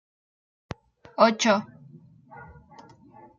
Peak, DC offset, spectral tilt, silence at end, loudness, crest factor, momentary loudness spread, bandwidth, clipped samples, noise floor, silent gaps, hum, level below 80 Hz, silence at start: -4 dBFS; under 0.1%; -4 dB/octave; 0.95 s; -22 LUFS; 24 dB; 27 LU; 7.4 kHz; under 0.1%; -52 dBFS; none; none; -62 dBFS; 1.2 s